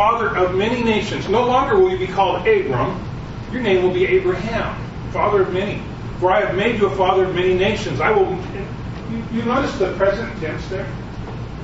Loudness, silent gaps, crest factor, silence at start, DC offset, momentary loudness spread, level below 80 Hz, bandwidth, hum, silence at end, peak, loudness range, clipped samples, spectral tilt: -19 LUFS; none; 16 dB; 0 s; under 0.1%; 12 LU; -36 dBFS; 8 kHz; none; 0 s; -2 dBFS; 3 LU; under 0.1%; -6.5 dB/octave